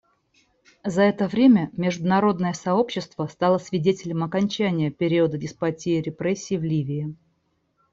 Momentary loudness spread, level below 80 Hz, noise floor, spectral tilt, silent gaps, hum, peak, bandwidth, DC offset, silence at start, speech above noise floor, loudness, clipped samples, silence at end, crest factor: 8 LU; -62 dBFS; -70 dBFS; -6.5 dB/octave; none; none; -6 dBFS; 8 kHz; under 0.1%; 0.85 s; 47 dB; -23 LUFS; under 0.1%; 0.8 s; 16 dB